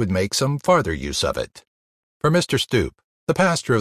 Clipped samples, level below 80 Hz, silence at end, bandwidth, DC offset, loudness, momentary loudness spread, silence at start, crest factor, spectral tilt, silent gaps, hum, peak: under 0.1%; -40 dBFS; 0 s; 14.5 kHz; under 0.1%; -21 LUFS; 10 LU; 0 s; 18 dB; -4.5 dB/octave; 1.67-2.20 s, 3.04-3.27 s; none; -4 dBFS